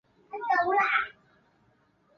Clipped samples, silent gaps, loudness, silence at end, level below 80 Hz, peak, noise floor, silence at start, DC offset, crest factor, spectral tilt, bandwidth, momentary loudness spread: under 0.1%; none; -27 LUFS; 1.05 s; -72 dBFS; -12 dBFS; -67 dBFS; 0.3 s; under 0.1%; 18 dB; -4 dB/octave; 6.8 kHz; 14 LU